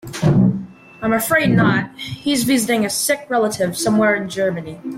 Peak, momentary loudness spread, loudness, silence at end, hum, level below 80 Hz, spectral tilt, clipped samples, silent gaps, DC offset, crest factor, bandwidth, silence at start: -4 dBFS; 10 LU; -17 LUFS; 0 s; none; -48 dBFS; -5 dB/octave; under 0.1%; none; under 0.1%; 14 dB; 16.5 kHz; 0.05 s